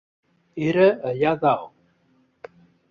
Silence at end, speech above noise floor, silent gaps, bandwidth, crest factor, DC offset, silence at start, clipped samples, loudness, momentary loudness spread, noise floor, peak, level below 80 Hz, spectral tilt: 1.25 s; 43 dB; none; 7 kHz; 20 dB; under 0.1%; 0.55 s; under 0.1%; -21 LUFS; 16 LU; -63 dBFS; -4 dBFS; -62 dBFS; -8 dB/octave